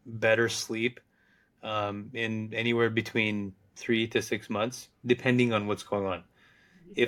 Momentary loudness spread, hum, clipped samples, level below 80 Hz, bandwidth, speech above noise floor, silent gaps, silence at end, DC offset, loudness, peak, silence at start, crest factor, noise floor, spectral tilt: 12 LU; none; under 0.1%; -70 dBFS; 17 kHz; 38 dB; none; 0 s; under 0.1%; -29 LUFS; -10 dBFS; 0.05 s; 20 dB; -67 dBFS; -5 dB/octave